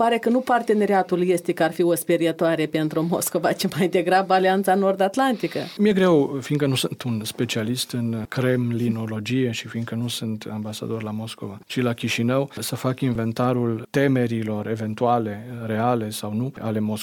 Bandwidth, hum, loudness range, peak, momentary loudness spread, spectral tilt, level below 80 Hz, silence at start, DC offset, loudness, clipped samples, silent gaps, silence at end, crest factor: 18 kHz; none; 6 LU; -8 dBFS; 9 LU; -5.5 dB/octave; -62 dBFS; 0 s; under 0.1%; -23 LUFS; under 0.1%; none; 0 s; 14 dB